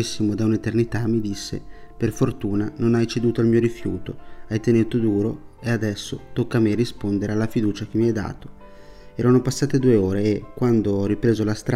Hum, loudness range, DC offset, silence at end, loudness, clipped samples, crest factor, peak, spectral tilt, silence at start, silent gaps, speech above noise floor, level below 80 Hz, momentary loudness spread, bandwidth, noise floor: none; 2 LU; under 0.1%; 0 s; -22 LUFS; under 0.1%; 16 dB; -6 dBFS; -7 dB/octave; 0 s; none; 21 dB; -44 dBFS; 11 LU; 14 kHz; -42 dBFS